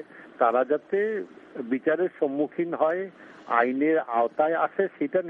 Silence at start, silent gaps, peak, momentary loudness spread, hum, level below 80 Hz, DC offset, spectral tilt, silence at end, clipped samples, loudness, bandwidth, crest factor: 0 s; none; -8 dBFS; 10 LU; none; -78 dBFS; under 0.1%; -8.5 dB/octave; 0 s; under 0.1%; -26 LUFS; 4.6 kHz; 18 dB